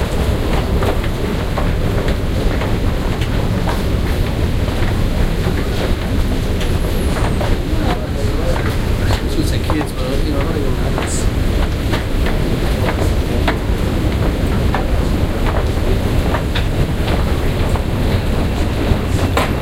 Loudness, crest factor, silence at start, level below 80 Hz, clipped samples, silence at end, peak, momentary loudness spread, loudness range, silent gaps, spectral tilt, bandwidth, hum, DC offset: -18 LUFS; 14 dB; 0 s; -18 dBFS; under 0.1%; 0 s; -2 dBFS; 2 LU; 1 LU; none; -6 dB/octave; 16.5 kHz; none; under 0.1%